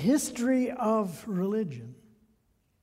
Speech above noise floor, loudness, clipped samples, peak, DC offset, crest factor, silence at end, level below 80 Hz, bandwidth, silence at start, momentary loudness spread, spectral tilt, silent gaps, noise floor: 42 dB; -29 LUFS; under 0.1%; -14 dBFS; under 0.1%; 16 dB; 0.9 s; -66 dBFS; 16 kHz; 0 s; 11 LU; -5.5 dB/octave; none; -70 dBFS